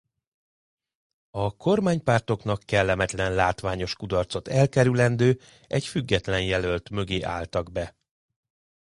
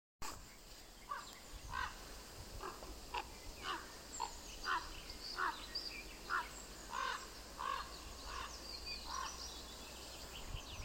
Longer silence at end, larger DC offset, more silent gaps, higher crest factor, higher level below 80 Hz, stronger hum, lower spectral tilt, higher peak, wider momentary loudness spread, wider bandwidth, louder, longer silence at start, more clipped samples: first, 0.9 s vs 0 s; neither; neither; about the same, 20 dB vs 22 dB; first, -46 dBFS vs -56 dBFS; neither; first, -6 dB/octave vs -2 dB/octave; first, -6 dBFS vs -26 dBFS; about the same, 9 LU vs 11 LU; second, 11.5 kHz vs 16.5 kHz; first, -25 LUFS vs -46 LUFS; first, 1.35 s vs 0.2 s; neither